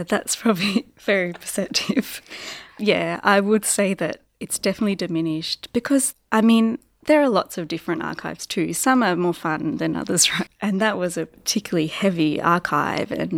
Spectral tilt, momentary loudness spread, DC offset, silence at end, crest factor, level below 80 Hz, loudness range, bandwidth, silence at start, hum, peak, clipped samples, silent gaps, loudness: -3.5 dB/octave; 10 LU; under 0.1%; 0 s; 20 dB; -58 dBFS; 1 LU; 17 kHz; 0 s; none; -2 dBFS; under 0.1%; none; -21 LUFS